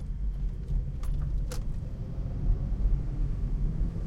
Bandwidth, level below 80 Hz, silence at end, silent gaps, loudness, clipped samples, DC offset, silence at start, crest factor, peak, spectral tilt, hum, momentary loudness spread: 11 kHz; -30 dBFS; 0 s; none; -34 LUFS; under 0.1%; under 0.1%; 0 s; 14 dB; -16 dBFS; -8 dB/octave; none; 5 LU